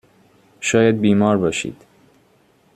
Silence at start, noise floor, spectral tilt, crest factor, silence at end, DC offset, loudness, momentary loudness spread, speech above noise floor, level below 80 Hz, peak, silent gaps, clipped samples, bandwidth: 0.6 s; -57 dBFS; -5.5 dB/octave; 18 dB; 1 s; under 0.1%; -17 LUFS; 10 LU; 40 dB; -56 dBFS; -2 dBFS; none; under 0.1%; 11.5 kHz